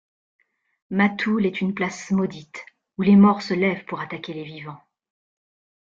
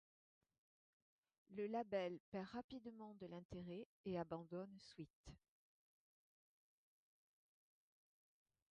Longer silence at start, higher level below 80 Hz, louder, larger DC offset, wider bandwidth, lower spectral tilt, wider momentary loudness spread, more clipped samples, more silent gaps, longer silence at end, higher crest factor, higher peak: second, 0.9 s vs 1.5 s; first, -62 dBFS vs -78 dBFS; first, -21 LUFS vs -51 LUFS; neither; about the same, 7.6 kHz vs 7.6 kHz; first, -7 dB/octave vs -5.5 dB/octave; first, 23 LU vs 13 LU; neither; second, none vs 2.20-2.32 s, 2.64-2.69 s, 3.45-3.49 s, 3.85-4.04 s, 5.10-5.24 s; second, 1.2 s vs 3.35 s; about the same, 18 dB vs 22 dB; first, -6 dBFS vs -32 dBFS